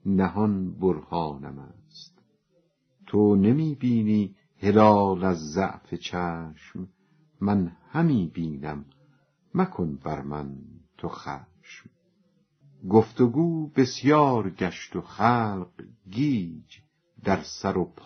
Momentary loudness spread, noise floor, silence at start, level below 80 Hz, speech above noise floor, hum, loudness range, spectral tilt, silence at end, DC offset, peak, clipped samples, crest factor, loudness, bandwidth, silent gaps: 19 LU; -69 dBFS; 0.05 s; -56 dBFS; 44 dB; none; 10 LU; -7 dB/octave; 0.2 s; under 0.1%; -4 dBFS; under 0.1%; 22 dB; -25 LUFS; 6.4 kHz; none